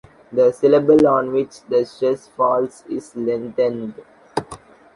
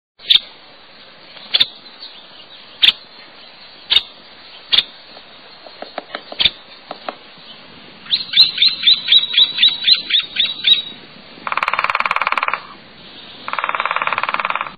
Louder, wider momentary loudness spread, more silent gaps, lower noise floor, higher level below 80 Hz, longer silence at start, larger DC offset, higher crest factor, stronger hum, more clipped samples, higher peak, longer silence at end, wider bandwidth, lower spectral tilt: second, -19 LUFS vs -14 LUFS; second, 15 LU vs 21 LU; neither; about the same, -41 dBFS vs -42 dBFS; about the same, -56 dBFS vs -56 dBFS; about the same, 0.3 s vs 0.2 s; second, under 0.1% vs 0.3%; about the same, 16 dB vs 18 dB; neither; neither; about the same, -2 dBFS vs 0 dBFS; first, 0.4 s vs 0 s; second, 11.5 kHz vs 19 kHz; first, -7 dB/octave vs -1.5 dB/octave